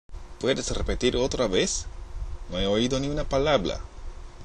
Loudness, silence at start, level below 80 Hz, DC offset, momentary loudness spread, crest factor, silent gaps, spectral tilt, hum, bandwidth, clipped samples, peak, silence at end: -26 LUFS; 0.1 s; -36 dBFS; under 0.1%; 17 LU; 20 dB; none; -4 dB/octave; none; 11 kHz; under 0.1%; -8 dBFS; 0 s